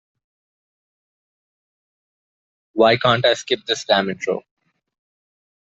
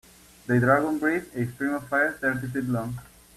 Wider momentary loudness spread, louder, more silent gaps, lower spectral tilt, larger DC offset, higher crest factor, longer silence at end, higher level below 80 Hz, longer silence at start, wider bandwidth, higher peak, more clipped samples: about the same, 11 LU vs 12 LU; first, -18 LUFS vs -25 LUFS; neither; second, -4 dB/octave vs -7.5 dB/octave; neither; about the same, 22 dB vs 20 dB; first, 1.2 s vs 0.35 s; second, -62 dBFS vs -56 dBFS; first, 2.75 s vs 0.45 s; second, 8.2 kHz vs 14.5 kHz; first, -2 dBFS vs -6 dBFS; neither